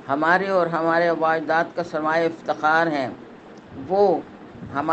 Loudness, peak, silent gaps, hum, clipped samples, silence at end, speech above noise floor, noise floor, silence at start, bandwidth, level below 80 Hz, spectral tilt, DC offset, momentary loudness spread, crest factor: -21 LUFS; -4 dBFS; none; none; under 0.1%; 0 s; 21 dB; -43 dBFS; 0 s; 8.4 kHz; -62 dBFS; -6.5 dB/octave; under 0.1%; 17 LU; 18 dB